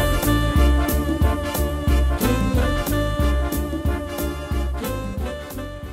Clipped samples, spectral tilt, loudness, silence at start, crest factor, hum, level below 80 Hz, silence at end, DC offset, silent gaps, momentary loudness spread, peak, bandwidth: under 0.1%; -6 dB/octave; -22 LUFS; 0 s; 16 dB; none; -24 dBFS; 0 s; under 0.1%; none; 9 LU; -6 dBFS; 16 kHz